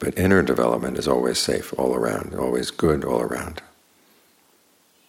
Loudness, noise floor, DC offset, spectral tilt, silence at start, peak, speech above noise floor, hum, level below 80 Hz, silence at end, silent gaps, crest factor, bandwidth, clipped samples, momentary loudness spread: -22 LUFS; -60 dBFS; under 0.1%; -5 dB/octave; 0 s; -4 dBFS; 38 dB; none; -48 dBFS; 1.5 s; none; 18 dB; 17 kHz; under 0.1%; 8 LU